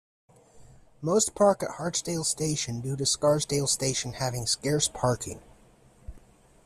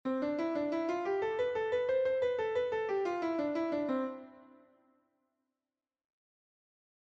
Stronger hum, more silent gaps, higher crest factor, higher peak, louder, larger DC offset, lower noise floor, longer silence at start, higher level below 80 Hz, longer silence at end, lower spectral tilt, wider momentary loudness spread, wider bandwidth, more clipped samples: neither; neither; first, 20 dB vs 14 dB; first, -10 dBFS vs -22 dBFS; first, -27 LUFS vs -34 LUFS; neither; second, -57 dBFS vs under -90 dBFS; first, 0.55 s vs 0.05 s; first, -54 dBFS vs -72 dBFS; second, 0.5 s vs 2.6 s; second, -3.5 dB/octave vs -6 dB/octave; first, 8 LU vs 3 LU; first, 14.5 kHz vs 7.6 kHz; neither